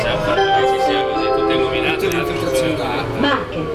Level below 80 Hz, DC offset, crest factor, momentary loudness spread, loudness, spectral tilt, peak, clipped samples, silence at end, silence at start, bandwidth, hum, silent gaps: -38 dBFS; under 0.1%; 14 dB; 4 LU; -17 LUFS; -5 dB/octave; -4 dBFS; under 0.1%; 0 s; 0 s; 16 kHz; none; none